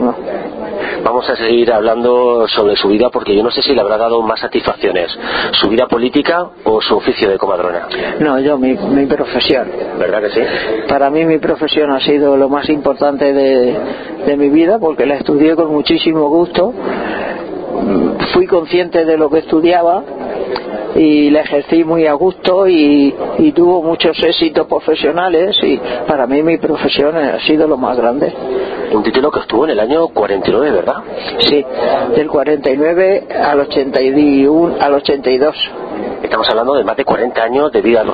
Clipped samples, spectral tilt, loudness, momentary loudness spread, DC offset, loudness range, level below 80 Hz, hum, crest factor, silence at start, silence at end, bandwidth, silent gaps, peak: under 0.1%; -8 dB/octave; -12 LUFS; 7 LU; under 0.1%; 2 LU; -44 dBFS; none; 12 dB; 0 s; 0 s; 5 kHz; none; 0 dBFS